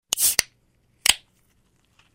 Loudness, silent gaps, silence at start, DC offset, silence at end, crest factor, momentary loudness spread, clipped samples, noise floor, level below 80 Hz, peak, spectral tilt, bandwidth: -21 LUFS; none; 0.15 s; under 0.1%; 1 s; 24 dB; 14 LU; under 0.1%; -64 dBFS; -56 dBFS; -2 dBFS; 2 dB/octave; 16.5 kHz